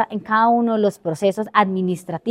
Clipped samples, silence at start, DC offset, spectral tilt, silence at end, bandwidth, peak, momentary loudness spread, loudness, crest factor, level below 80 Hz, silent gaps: under 0.1%; 0 s; under 0.1%; -6.5 dB/octave; 0 s; 14.5 kHz; 0 dBFS; 7 LU; -19 LUFS; 18 dB; -66 dBFS; none